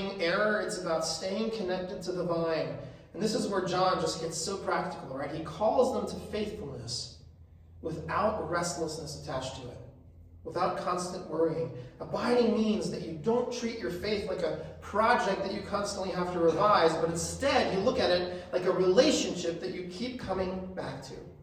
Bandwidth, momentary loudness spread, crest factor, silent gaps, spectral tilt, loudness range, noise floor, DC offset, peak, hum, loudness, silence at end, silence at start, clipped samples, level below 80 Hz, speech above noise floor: 15 kHz; 13 LU; 20 dB; none; -4.5 dB/octave; 7 LU; -53 dBFS; under 0.1%; -10 dBFS; none; -31 LUFS; 0 s; 0 s; under 0.1%; -58 dBFS; 23 dB